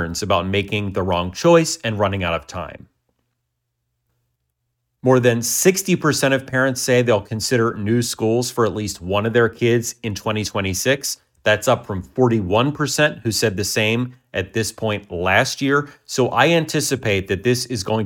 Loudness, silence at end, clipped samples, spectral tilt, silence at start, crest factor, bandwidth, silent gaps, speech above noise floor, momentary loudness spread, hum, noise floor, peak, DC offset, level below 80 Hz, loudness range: -19 LUFS; 0 s; under 0.1%; -4.5 dB/octave; 0 s; 18 dB; 19 kHz; none; 56 dB; 8 LU; none; -75 dBFS; -2 dBFS; under 0.1%; -50 dBFS; 4 LU